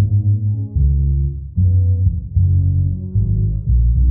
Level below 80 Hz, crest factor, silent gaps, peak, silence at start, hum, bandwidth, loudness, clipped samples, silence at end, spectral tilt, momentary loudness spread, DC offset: -20 dBFS; 10 dB; none; -4 dBFS; 0 s; none; 0.7 kHz; -17 LUFS; under 0.1%; 0 s; -18 dB/octave; 4 LU; under 0.1%